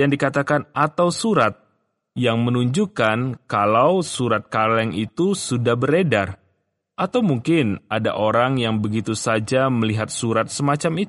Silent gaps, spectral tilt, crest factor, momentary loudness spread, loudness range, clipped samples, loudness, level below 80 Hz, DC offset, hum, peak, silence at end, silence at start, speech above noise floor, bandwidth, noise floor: none; -5.5 dB/octave; 16 dB; 5 LU; 2 LU; under 0.1%; -20 LUFS; -58 dBFS; under 0.1%; none; -4 dBFS; 0 s; 0 s; 50 dB; 11.5 kHz; -70 dBFS